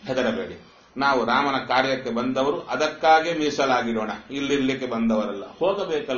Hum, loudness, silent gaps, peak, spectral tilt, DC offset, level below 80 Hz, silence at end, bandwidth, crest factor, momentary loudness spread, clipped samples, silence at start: none; -23 LUFS; none; -6 dBFS; -2.5 dB/octave; under 0.1%; -56 dBFS; 0 s; 7 kHz; 18 dB; 10 LU; under 0.1%; 0.05 s